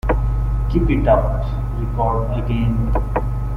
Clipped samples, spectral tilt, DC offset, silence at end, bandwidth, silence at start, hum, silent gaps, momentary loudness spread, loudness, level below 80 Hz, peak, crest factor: under 0.1%; -9.5 dB/octave; under 0.1%; 0 s; 5 kHz; 0.05 s; 50 Hz at -20 dBFS; none; 7 LU; -20 LUFS; -20 dBFS; -2 dBFS; 16 dB